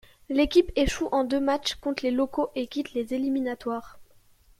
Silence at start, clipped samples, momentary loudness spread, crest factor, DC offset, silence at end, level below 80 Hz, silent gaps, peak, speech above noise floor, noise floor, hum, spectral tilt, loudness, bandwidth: 0.3 s; under 0.1%; 9 LU; 20 dB; under 0.1%; 0.55 s; -46 dBFS; none; -8 dBFS; 32 dB; -57 dBFS; none; -4.5 dB/octave; -27 LUFS; 15 kHz